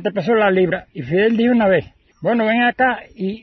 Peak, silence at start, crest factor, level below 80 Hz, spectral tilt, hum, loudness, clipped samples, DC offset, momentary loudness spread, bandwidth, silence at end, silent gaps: -4 dBFS; 0 s; 14 dB; -52 dBFS; -8 dB/octave; none; -17 LUFS; under 0.1%; under 0.1%; 10 LU; 6 kHz; 0.05 s; none